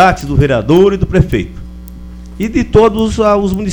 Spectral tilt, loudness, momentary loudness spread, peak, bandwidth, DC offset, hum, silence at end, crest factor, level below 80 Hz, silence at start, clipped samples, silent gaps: -7 dB/octave; -11 LUFS; 22 LU; 0 dBFS; over 20 kHz; under 0.1%; none; 0 s; 12 dB; -24 dBFS; 0 s; 0.4%; none